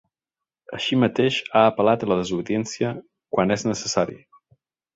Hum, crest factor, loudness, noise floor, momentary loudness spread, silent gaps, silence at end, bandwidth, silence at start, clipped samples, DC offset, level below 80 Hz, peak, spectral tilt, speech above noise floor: none; 22 dB; -22 LUFS; -89 dBFS; 10 LU; none; 0.8 s; 8 kHz; 0.7 s; under 0.1%; under 0.1%; -58 dBFS; -2 dBFS; -5 dB/octave; 67 dB